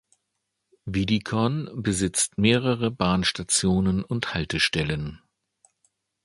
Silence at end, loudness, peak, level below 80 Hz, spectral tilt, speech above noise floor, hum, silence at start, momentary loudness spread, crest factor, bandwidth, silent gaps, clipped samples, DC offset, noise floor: 1.1 s; -24 LUFS; -4 dBFS; -46 dBFS; -4 dB/octave; 55 dB; none; 0.85 s; 8 LU; 22 dB; 11.5 kHz; none; under 0.1%; under 0.1%; -79 dBFS